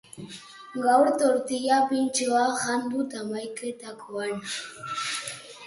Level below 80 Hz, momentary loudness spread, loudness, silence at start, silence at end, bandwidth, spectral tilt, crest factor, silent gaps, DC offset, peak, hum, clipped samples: -72 dBFS; 16 LU; -26 LUFS; 0.15 s; 0 s; 11.5 kHz; -3 dB/octave; 18 dB; none; under 0.1%; -8 dBFS; none; under 0.1%